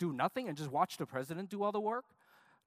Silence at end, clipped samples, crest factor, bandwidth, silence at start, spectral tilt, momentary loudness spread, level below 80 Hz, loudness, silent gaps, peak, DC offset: 0.65 s; under 0.1%; 20 dB; 15.5 kHz; 0 s; -6 dB/octave; 6 LU; -84 dBFS; -38 LUFS; none; -18 dBFS; under 0.1%